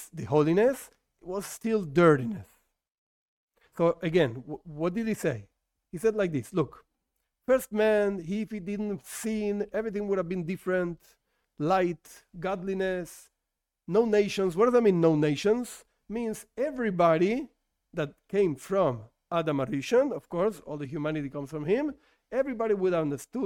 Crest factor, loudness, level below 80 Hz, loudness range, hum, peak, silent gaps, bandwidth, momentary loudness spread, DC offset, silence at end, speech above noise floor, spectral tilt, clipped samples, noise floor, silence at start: 20 dB; -28 LUFS; -60 dBFS; 5 LU; none; -8 dBFS; 2.91-3.48 s; 17 kHz; 13 LU; under 0.1%; 0 s; 58 dB; -6.5 dB/octave; under 0.1%; -85 dBFS; 0 s